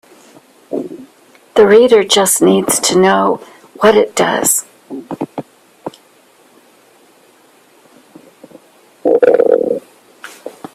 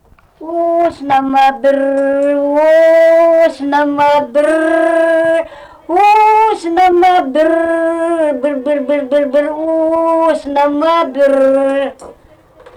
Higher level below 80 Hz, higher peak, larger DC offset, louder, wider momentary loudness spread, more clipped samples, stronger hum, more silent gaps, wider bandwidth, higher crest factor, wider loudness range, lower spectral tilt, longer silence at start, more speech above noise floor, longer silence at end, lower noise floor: second, -58 dBFS vs -50 dBFS; first, 0 dBFS vs -4 dBFS; neither; about the same, -12 LUFS vs -11 LUFS; first, 23 LU vs 7 LU; neither; neither; neither; first, 16 kHz vs 11.5 kHz; first, 14 dB vs 6 dB; first, 18 LU vs 3 LU; second, -3 dB/octave vs -4.5 dB/octave; first, 0.7 s vs 0.4 s; first, 38 dB vs 32 dB; second, 0.25 s vs 0.65 s; first, -48 dBFS vs -43 dBFS